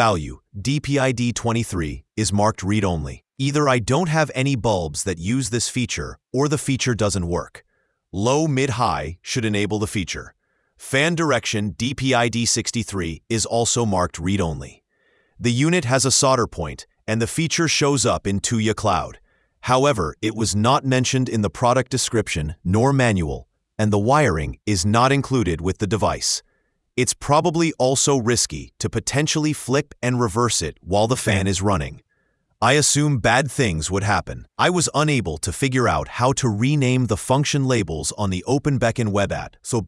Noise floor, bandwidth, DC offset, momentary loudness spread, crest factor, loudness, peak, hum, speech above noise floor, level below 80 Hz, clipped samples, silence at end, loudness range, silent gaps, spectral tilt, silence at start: -68 dBFS; 12 kHz; under 0.1%; 9 LU; 20 dB; -20 LUFS; 0 dBFS; none; 47 dB; -44 dBFS; under 0.1%; 0 s; 3 LU; none; -4.5 dB/octave; 0 s